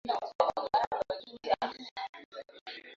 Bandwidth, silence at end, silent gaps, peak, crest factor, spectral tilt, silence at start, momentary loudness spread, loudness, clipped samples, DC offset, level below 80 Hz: 7.6 kHz; 0 s; 0.35-0.39 s, 0.87-0.91 s, 1.91-1.96 s, 2.09-2.13 s, 2.25-2.32 s, 2.61-2.66 s; -12 dBFS; 24 dB; -4 dB/octave; 0.05 s; 15 LU; -33 LUFS; under 0.1%; under 0.1%; -68 dBFS